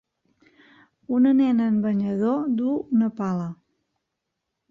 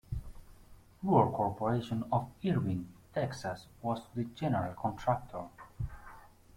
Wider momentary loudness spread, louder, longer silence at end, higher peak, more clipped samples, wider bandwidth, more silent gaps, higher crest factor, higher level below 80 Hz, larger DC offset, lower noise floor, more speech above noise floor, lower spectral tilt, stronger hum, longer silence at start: second, 9 LU vs 15 LU; first, -23 LUFS vs -35 LUFS; first, 1.15 s vs 0.3 s; about the same, -10 dBFS vs -12 dBFS; neither; second, 6.8 kHz vs 16.5 kHz; neither; second, 14 dB vs 22 dB; second, -68 dBFS vs -52 dBFS; neither; first, -81 dBFS vs -57 dBFS; first, 59 dB vs 24 dB; first, -9.5 dB/octave vs -8 dB/octave; neither; first, 1.1 s vs 0.1 s